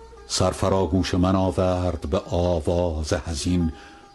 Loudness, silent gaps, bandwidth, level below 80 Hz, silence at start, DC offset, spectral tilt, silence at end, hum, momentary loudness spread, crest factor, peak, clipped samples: -23 LUFS; none; 12.5 kHz; -34 dBFS; 0 s; under 0.1%; -6 dB/octave; 0.15 s; none; 6 LU; 16 dB; -6 dBFS; under 0.1%